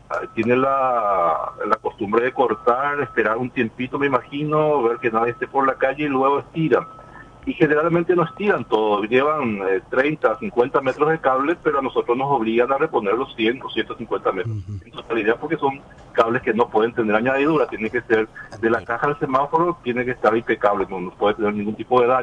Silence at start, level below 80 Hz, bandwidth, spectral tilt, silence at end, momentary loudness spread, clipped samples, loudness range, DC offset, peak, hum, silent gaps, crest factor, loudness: 0.1 s; -52 dBFS; 7.8 kHz; -7.5 dB/octave; 0 s; 6 LU; under 0.1%; 2 LU; under 0.1%; -2 dBFS; none; none; 18 dB; -20 LUFS